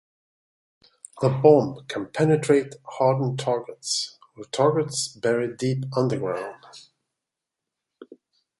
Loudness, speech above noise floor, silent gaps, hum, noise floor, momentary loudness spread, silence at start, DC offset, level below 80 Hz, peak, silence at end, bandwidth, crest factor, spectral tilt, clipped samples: -23 LUFS; 63 dB; none; none; -86 dBFS; 14 LU; 1.15 s; under 0.1%; -66 dBFS; -2 dBFS; 0.55 s; 11.5 kHz; 22 dB; -5.5 dB/octave; under 0.1%